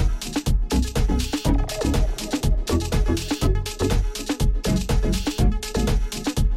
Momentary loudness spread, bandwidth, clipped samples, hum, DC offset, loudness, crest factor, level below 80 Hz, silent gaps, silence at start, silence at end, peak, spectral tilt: 3 LU; 15.5 kHz; under 0.1%; none; under 0.1%; -24 LUFS; 14 dB; -24 dBFS; none; 0 s; 0 s; -8 dBFS; -5.5 dB/octave